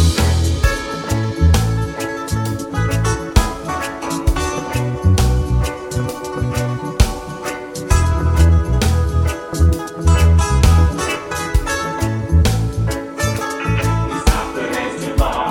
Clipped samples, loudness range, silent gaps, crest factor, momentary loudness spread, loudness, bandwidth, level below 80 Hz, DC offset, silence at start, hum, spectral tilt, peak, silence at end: under 0.1%; 4 LU; none; 16 dB; 9 LU; -18 LUFS; 16.5 kHz; -20 dBFS; under 0.1%; 0 s; none; -5.5 dB/octave; 0 dBFS; 0 s